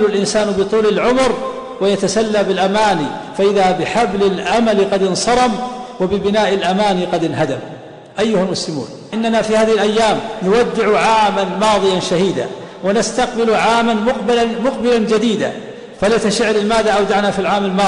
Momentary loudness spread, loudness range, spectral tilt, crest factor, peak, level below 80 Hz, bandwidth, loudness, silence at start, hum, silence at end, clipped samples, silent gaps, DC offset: 9 LU; 3 LU; -4.5 dB/octave; 12 dB; -4 dBFS; -44 dBFS; 10.5 kHz; -15 LUFS; 0 s; none; 0 s; under 0.1%; none; under 0.1%